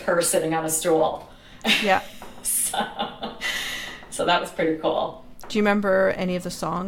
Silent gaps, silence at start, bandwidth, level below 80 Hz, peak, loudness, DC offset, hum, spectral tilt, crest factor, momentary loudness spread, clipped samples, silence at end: none; 0 s; 17 kHz; -50 dBFS; -6 dBFS; -23 LUFS; under 0.1%; none; -3 dB/octave; 18 dB; 11 LU; under 0.1%; 0 s